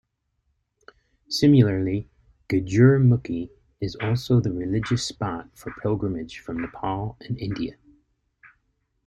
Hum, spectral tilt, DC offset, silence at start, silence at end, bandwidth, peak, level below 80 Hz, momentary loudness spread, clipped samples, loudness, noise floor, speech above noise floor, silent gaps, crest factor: none; -7 dB/octave; under 0.1%; 1.3 s; 1.35 s; 12.5 kHz; -4 dBFS; -50 dBFS; 16 LU; under 0.1%; -24 LUFS; -73 dBFS; 51 dB; none; 20 dB